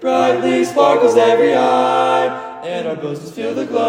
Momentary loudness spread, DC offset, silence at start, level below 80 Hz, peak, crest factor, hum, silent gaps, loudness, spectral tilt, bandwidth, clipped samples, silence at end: 13 LU; under 0.1%; 0 s; -64 dBFS; 0 dBFS; 14 dB; none; none; -15 LUFS; -5 dB/octave; 15.5 kHz; under 0.1%; 0 s